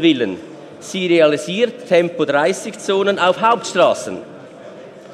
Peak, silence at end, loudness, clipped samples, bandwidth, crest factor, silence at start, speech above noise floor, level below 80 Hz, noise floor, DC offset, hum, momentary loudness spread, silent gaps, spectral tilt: 0 dBFS; 0 s; -16 LUFS; under 0.1%; 13 kHz; 16 dB; 0 s; 20 dB; -68 dBFS; -36 dBFS; under 0.1%; none; 23 LU; none; -4.5 dB/octave